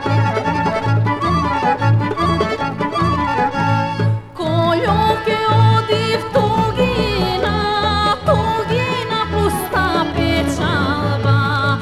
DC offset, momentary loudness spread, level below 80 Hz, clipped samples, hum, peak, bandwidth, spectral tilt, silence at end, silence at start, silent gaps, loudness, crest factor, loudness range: under 0.1%; 3 LU; -34 dBFS; under 0.1%; none; -2 dBFS; 14 kHz; -6.5 dB/octave; 0 s; 0 s; none; -17 LUFS; 14 dB; 1 LU